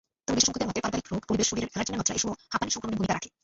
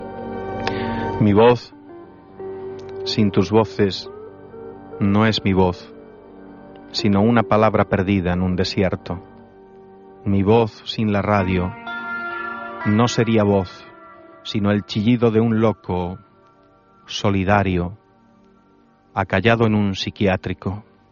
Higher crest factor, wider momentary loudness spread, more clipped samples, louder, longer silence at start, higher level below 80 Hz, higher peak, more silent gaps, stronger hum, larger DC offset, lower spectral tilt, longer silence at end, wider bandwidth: about the same, 22 dB vs 18 dB; second, 7 LU vs 16 LU; neither; second, -28 LUFS vs -19 LUFS; first, 0.3 s vs 0 s; second, -52 dBFS vs -46 dBFS; second, -6 dBFS vs -2 dBFS; neither; neither; neither; second, -3 dB/octave vs -5.5 dB/octave; second, 0.15 s vs 0.3 s; first, 8.2 kHz vs 7.2 kHz